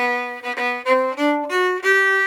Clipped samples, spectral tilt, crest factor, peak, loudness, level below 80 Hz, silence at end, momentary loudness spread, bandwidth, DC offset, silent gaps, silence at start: under 0.1%; -1.5 dB/octave; 14 dB; -6 dBFS; -19 LUFS; -74 dBFS; 0 s; 8 LU; 18 kHz; under 0.1%; none; 0 s